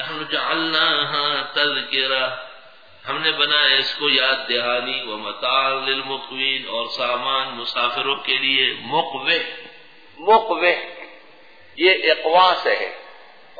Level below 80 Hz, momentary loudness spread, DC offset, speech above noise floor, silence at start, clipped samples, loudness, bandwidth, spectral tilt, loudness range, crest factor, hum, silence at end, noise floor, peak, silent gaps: -70 dBFS; 12 LU; 0.4%; 28 dB; 0 s; under 0.1%; -19 LUFS; 5 kHz; -4 dB/octave; 3 LU; 18 dB; none; 0.45 s; -49 dBFS; -2 dBFS; none